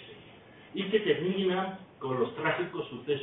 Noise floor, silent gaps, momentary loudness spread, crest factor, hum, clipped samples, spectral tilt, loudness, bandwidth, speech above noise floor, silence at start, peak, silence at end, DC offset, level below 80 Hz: -53 dBFS; none; 13 LU; 18 dB; none; under 0.1%; -9.5 dB/octave; -31 LUFS; 4 kHz; 23 dB; 0 s; -14 dBFS; 0 s; under 0.1%; -70 dBFS